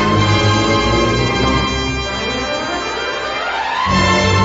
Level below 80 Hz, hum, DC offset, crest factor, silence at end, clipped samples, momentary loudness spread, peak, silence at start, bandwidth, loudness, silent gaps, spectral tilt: -28 dBFS; none; under 0.1%; 12 dB; 0 s; under 0.1%; 7 LU; -2 dBFS; 0 s; 8 kHz; -16 LUFS; none; -4.5 dB/octave